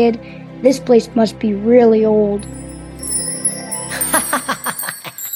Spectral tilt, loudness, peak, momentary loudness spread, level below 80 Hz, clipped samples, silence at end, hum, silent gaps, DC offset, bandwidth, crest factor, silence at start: -4 dB/octave; -16 LUFS; 0 dBFS; 16 LU; -44 dBFS; under 0.1%; 0 s; none; none; under 0.1%; 17 kHz; 16 dB; 0 s